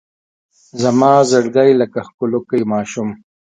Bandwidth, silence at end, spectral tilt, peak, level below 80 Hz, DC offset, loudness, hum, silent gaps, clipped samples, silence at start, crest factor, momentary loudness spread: 9.4 kHz; 0.45 s; -5.5 dB/octave; 0 dBFS; -60 dBFS; under 0.1%; -15 LUFS; none; 2.14-2.18 s; under 0.1%; 0.75 s; 16 dB; 12 LU